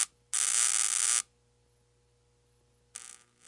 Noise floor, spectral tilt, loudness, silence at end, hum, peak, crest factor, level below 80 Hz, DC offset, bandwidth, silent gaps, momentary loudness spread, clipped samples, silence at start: -69 dBFS; 4 dB/octave; -26 LUFS; 0.4 s; 60 Hz at -70 dBFS; -6 dBFS; 26 dB; -76 dBFS; under 0.1%; 11.5 kHz; none; 23 LU; under 0.1%; 0 s